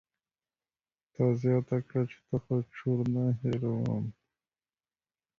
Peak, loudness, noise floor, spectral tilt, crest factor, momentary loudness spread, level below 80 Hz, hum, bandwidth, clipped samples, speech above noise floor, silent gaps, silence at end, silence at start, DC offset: -16 dBFS; -31 LUFS; under -90 dBFS; -10 dB/octave; 18 dB; 7 LU; -64 dBFS; none; 6.8 kHz; under 0.1%; over 60 dB; none; 1.3 s; 1.2 s; under 0.1%